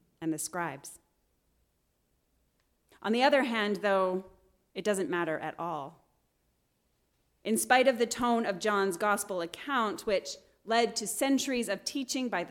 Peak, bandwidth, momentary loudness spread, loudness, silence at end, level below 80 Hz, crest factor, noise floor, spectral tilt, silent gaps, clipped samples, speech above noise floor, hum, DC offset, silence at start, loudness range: -10 dBFS; 18 kHz; 13 LU; -30 LUFS; 0 s; -70 dBFS; 22 dB; -75 dBFS; -3 dB/octave; none; under 0.1%; 45 dB; none; under 0.1%; 0.2 s; 6 LU